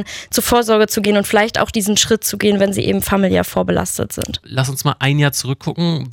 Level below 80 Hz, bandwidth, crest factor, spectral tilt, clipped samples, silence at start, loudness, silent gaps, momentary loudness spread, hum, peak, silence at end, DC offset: -42 dBFS; 17.5 kHz; 14 dB; -4 dB/octave; under 0.1%; 0 s; -16 LUFS; none; 7 LU; none; -2 dBFS; 0 s; under 0.1%